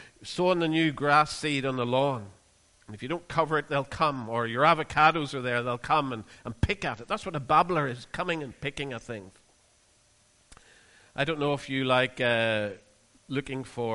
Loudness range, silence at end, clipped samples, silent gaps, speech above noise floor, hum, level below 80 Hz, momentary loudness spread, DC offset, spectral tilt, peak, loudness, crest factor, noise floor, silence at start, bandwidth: 8 LU; 0 s; under 0.1%; none; 36 dB; none; -50 dBFS; 14 LU; under 0.1%; -5.5 dB/octave; -8 dBFS; -27 LUFS; 20 dB; -64 dBFS; 0 s; 11.5 kHz